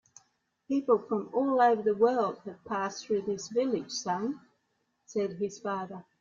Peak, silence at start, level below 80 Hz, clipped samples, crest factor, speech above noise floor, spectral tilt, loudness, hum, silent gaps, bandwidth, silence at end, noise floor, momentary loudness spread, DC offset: -12 dBFS; 0.7 s; -74 dBFS; under 0.1%; 18 dB; 48 dB; -5 dB/octave; -30 LUFS; none; none; 7.6 kHz; 0.2 s; -77 dBFS; 12 LU; under 0.1%